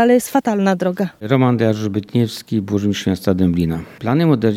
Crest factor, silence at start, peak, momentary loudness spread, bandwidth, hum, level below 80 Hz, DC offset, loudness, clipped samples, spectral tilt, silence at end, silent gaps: 16 dB; 0 s; 0 dBFS; 7 LU; 16.5 kHz; none; -46 dBFS; under 0.1%; -18 LUFS; under 0.1%; -7 dB/octave; 0 s; none